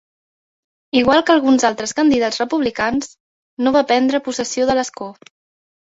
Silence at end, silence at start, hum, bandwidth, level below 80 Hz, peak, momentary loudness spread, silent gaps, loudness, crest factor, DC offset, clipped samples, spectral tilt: 0.75 s; 0.95 s; none; 8 kHz; -52 dBFS; -2 dBFS; 11 LU; 3.20-3.57 s; -17 LUFS; 16 dB; under 0.1%; under 0.1%; -3.5 dB/octave